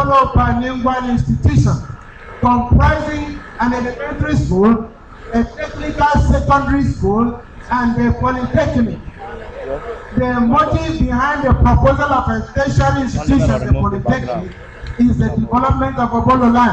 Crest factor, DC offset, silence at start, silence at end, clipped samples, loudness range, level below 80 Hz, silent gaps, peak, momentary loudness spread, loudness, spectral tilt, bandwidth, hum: 12 dB; under 0.1%; 0 s; 0 s; under 0.1%; 3 LU; -24 dBFS; none; -4 dBFS; 13 LU; -15 LUFS; -7.5 dB/octave; 8.4 kHz; none